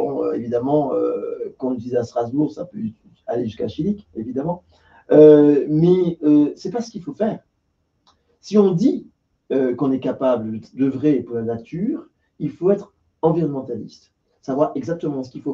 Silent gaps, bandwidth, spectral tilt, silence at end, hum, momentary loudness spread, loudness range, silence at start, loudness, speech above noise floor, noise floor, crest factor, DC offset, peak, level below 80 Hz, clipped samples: none; 7.2 kHz; -9 dB/octave; 0 s; none; 14 LU; 8 LU; 0 s; -20 LUFS; 50 dB; -69 dBFS; 20 dB; under 0.1%; 0 dBFS; -58 dBFS; under 0.1%